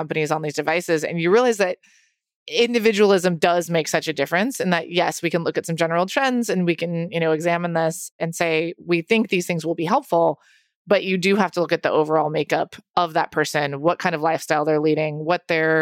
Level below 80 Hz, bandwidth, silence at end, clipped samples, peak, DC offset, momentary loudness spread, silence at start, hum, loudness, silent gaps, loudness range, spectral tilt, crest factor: -68 dBFS; 16.5 kHz; 0 s; under 0.1%; -4 dBFS; under 0.1%; 6 LU; 0 s; none; -21 LUFS; 2.35-2.46 s, 8.11-8.19 s, 10.75-10.85 s, 12.89-12.94 s; 2 LU; -5 dB/octave; 18 dB